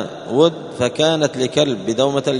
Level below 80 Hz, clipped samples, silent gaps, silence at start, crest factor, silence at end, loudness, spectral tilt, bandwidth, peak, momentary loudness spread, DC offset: -56 dBFS; under 0.1%; none; 0 s; 16 dB; 0 s; -18 LUFS; -4.5 dB/octave; 11 kHz; 0 dBFS; 6 LU; under 0.1%